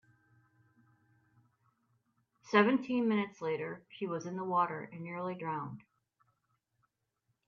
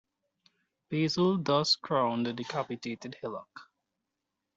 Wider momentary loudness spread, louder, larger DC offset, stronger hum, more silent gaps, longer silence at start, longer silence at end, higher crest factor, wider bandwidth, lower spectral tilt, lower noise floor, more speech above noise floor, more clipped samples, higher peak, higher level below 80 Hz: about the same, 15 LU vs 13 LU; second, -34 LUFS vs -30 LUFS; neither; neither; neither; first, 2.45 s vs 0.9 s; first, 1.65 s vs 0.95 s; first, 26 dB vs 18 dB; second, 7 kHz vs 8 kHz; first, -6.5 dB/octave vs -5 dB/octave; second, -82 dBFS vs -86 dBFS; second, 49 dB vs 55 dB; neither; about the same, -12 dBFS vs -14 dBFS; second, -82 dBFS vs -72 dBFS